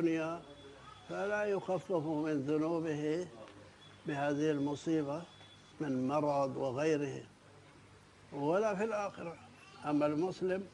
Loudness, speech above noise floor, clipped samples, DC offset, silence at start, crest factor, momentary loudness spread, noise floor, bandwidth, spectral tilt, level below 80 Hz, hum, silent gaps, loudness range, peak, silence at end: -36 LUFS; 25 dB; under 0.1%; under 0.1%; 0 s; 16 dB; 20 LU; -60 dBFS; 10.5 kHz; -6.5 dB/octave; -72 dBFS; none; none; 2 LU; -20 dBFS; 0.05 s